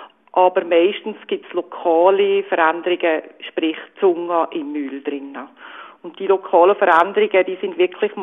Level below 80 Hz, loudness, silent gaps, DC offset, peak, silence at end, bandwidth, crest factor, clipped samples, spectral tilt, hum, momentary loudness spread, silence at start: -72 dBFS; -18 LUFS; none; under 0.1%; 0 dBFS; 0 s; 3.9 kHz; 18 dB; under 0.1%; -6.5 dB/octave; none; 15 LU; 0 s